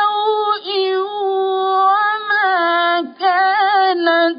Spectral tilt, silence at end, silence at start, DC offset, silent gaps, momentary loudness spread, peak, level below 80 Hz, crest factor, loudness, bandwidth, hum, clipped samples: -6.5 dB/octave; 0 s; 0 s; under 0.1%; none; 5 LU; -2 dBFS; -78 dBFS; 12 dB; -16 LUFS; 5.2 kHz; none; under 0.1%